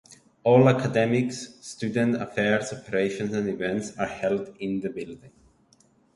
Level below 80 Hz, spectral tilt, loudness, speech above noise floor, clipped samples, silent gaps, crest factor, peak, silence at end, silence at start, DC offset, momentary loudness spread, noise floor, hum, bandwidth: -60 dBFS; -6.5 dB/octave; -25 LUFS; 37 dB; under 0.1%; none; 22 dB; -4 dBFS; 0.85 s; 0.1 s; under 0.1%; 14 LU; -61 dBFS; none; 11.5 kHz